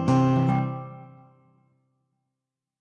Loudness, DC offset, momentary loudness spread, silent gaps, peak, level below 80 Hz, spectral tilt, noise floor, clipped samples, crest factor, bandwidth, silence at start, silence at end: -23 LUFS; under 0.1%; 22 LU; none; -14 dBFS; -56 dBFS; -8.5 dB/octave; -86 dBFS; under 0.1%; 14 dB; 8.6 kHz; 0 s; 1.75 s